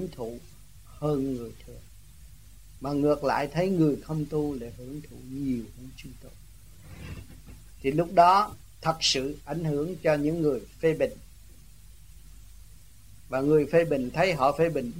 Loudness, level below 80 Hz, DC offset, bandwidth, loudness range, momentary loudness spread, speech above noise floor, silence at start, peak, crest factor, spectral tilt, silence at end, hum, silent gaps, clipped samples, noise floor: -27 LUFS; -50 dBFS; 0.3%; 16 kHz; 10 LU; 20 LU; 26 dB; 0 s; -6 dBFS; 22 dB; -5.5 dB/octave; 0 s; none; none; under 0.1%; -52 dBFS